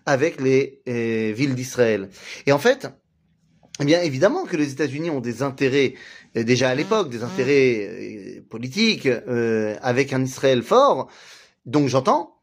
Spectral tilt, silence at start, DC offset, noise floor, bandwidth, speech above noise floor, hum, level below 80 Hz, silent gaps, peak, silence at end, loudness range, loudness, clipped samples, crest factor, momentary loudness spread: -5.5 dB/octave; 0.05 s; under 0.1%; -64 dBFS; 15.5 kHz; 43 dB; none; -64 dBFS; none; -4 dBFS; 0.15 s; 2 LU; -21 LUFS; under 0.1%; 18 dB; 12 LU